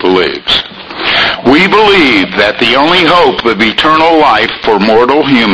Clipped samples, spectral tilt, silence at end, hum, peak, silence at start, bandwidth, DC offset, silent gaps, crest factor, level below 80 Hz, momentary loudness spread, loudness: 1%; -5 dB/octave; 0 s; none; 0 dBFS; 0 s; 11 kHz; under 0.1%; none; 8 dB; -36 dBFS; 5 LU; -7 LUFS